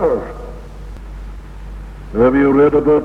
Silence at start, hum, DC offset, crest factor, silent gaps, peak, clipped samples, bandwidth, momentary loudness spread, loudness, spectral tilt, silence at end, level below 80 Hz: 0 s; none; under 0.1%; 14 dB; none; -2 dBFS; under 0.1%; 6.2 kHz; 23 LU; -13 LUFS; -9 dB/octave; 0 s; -32 dBFS